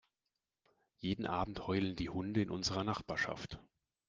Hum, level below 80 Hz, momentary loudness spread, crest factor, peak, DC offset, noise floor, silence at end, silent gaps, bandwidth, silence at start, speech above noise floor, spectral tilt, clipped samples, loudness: none; -60 dBFS; 9 LU; 20 dB; -20 dBFS; under 0.1%; -90 dBFS; 0.45 s; none; 9.6 kHz; 1 s; 52 dB; -5 dB/octave; under 0.1%; -38 LUFS